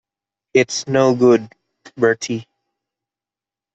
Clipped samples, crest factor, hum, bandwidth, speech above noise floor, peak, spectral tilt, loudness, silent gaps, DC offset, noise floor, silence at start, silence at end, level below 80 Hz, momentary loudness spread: under 0.1%; 16 dB; none; 8.2 kHz; 74 dB; -2 dBFS; -5 dB/octave; -17 LUFS; none; under 0.1%; -89 dBFS; 0.55 s; 1.3 s; -62 dBFS; 10 LU